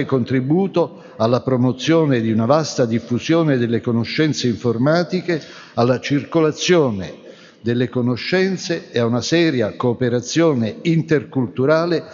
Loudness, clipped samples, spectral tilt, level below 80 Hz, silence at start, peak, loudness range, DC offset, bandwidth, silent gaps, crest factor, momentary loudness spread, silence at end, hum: -18 LUFS; under 0.1%; -6 dB/octave; -60 dBFS; 0 s; 0 dBFS; 2 LU; under 0.1%; 7.6 kHz; none; 16 dB; 6 LU; 0 s; none